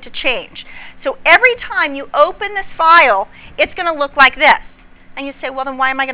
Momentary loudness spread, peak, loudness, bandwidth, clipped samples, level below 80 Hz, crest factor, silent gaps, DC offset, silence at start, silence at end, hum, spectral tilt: 19 LU; 0 dBFS; -12 LUFS; 4 kHz; 0.8%; -44 dBFS; 14 dB; none; under 0.1%; 0 s; 0 s; none; -5.5 dB/octave